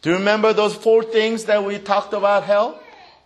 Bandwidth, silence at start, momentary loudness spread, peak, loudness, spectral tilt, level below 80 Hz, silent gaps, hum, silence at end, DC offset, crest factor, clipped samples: 12 kHz; 0.05 s; 4 LU; -2 dBFS; -18 LUFS; -4.5 dB/octave; -64 dBFS; none; none; 0.4 s; under 0.1%; 16 dB; under 0.1%